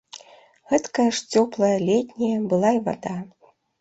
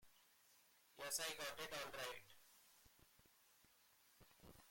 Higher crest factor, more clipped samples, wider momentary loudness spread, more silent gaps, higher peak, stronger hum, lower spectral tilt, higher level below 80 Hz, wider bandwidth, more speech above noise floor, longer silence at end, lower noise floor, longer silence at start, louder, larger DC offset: second, 18 dB vs 24 dB; neither; second, 14 LU vs 24 LU; neither; first, -6 dBFS vs -32 dBFS; neither; first, -5.5 dB/octave vs -0.5 dB/octave; first, -64 dBFS vs -80 dBFS; second, 8.2 kHz vs 16.5 kHz; first, 30 dB vs 25 dB; first, 0.55 s vs 0 s; second, -51 dBFS vs -74 dBFS; first, 0.15 s vs 0 s; first, -22 LUFS vs -48 LUFS; neither